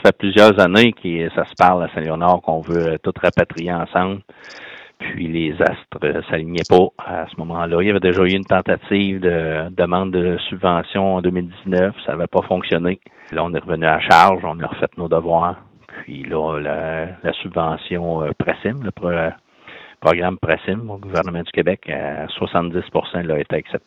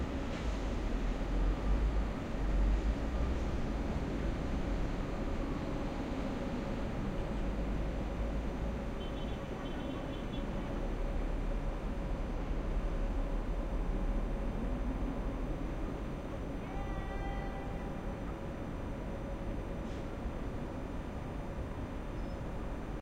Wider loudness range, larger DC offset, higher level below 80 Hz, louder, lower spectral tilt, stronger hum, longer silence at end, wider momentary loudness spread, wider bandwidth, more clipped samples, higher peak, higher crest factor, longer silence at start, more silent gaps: about the same, 5 LU vs 5 LU; neither; second, -50 dBFS vs -38 dBFS; first, -18 LUFS vs -39 LUFS; about the same, -6.5 dB/octave vs -7 dB/octave; neither; about the same, 0.1 s vs 0 s; first, 11 LU vs 6 LU; first, 13 kHz vs 8.8 kHz; first, 0.1% vs under 0.1%; first, 0 dBFS vs -20 dBFS; about the same, 18 dB vs 14 dB; about the same, 0 s vs 0 s; neither